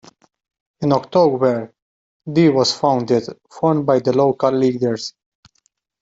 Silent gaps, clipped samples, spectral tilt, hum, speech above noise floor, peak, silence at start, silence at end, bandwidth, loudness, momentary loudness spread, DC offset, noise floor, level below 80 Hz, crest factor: 1.82-2.20 s; under 0.1%; -6 dB/octave; none; 49 dB; -2 dBFS; 0.8 s; 0.9 s; 8 kHz; -17 LUFS; 12 LU; under 0.1%; -65 dBFS; -60 dBFS; 16 dB